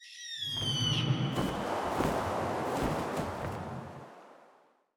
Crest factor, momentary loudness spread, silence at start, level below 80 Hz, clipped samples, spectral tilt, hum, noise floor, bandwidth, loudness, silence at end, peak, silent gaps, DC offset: 20 dB; 13 LU; 0 s; -54 dBFS; under 0.1%; -5 dB/octave; none; -64 dBFS; over 20 kHz; -33 LUFS; 0.5 s; -14 dBFS; none; under 0.1%